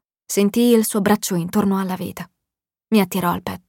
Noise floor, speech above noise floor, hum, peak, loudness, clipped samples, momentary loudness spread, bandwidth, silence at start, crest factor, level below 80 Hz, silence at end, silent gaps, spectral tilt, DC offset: -86 dBFS; 67 dB; none; -4 dBFS; -19 LUFS; under 0.1%; 13 LU; 17 kHz; 0.3 s; 16 dB; -56 dBFS; 0.1 s; none; -5 dB/octave; under 0.1%